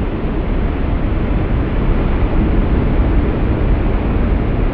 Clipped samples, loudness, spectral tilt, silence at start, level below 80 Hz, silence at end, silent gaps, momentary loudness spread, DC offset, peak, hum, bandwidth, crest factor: under 0.1%; -17 LUFS; -8 dB/octave; 0 s; -16 dBFS; 0 s; none; 3 LU; under 0.1%; -4 dBFS; none; 4.6 kHz; 12 dB